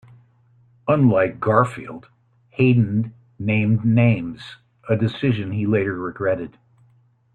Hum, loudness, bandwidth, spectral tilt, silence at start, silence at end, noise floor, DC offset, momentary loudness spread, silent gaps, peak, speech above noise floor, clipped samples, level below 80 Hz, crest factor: none; -20 LUFS; 8.6 kHz; -9 dB/octave; 0.85 s; 0.85 s; -58 dBFS; under 0.1%; 20 LU; none; -2 dBFS; 39 dB; under 0.1%; -56 dBFS; 18 dB